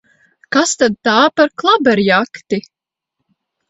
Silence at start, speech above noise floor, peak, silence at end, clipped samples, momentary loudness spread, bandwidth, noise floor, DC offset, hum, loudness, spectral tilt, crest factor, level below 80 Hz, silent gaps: 0.5 s; 63 dB; 0 dBFS; 1.1 s; under 0.1%; 10 LU; 8.2 kHz; -76 dBFS; under 0.1%; none; -14 LUFS; -3.5 dB/octave; 16 dB; -58 dBFS; none